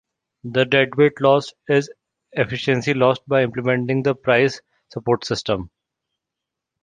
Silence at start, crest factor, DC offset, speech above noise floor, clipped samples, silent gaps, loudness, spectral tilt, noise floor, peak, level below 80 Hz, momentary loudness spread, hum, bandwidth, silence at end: 0.45 s; 18 dB; under 0.1%; 65 dB; under 0.1%; none; -19 LUFS; -6 dB/octave; -84 dBFS; -2 dBFS; -54 dBFS; 13 LU; none; 9.4 kHz; 1.15 s